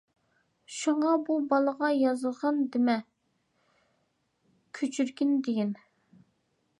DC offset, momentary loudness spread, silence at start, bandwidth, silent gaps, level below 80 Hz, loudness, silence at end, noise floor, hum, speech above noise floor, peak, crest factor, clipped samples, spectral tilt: under 0.1%; 8 LU; 0.7 s; 11 kHz; none; -84 dBFS; -28 LUFS; 1.05 s; -75 dBFS; none; 48 dB; -12 dBFS; 18 dB; under 0.1%; -5 dB/octave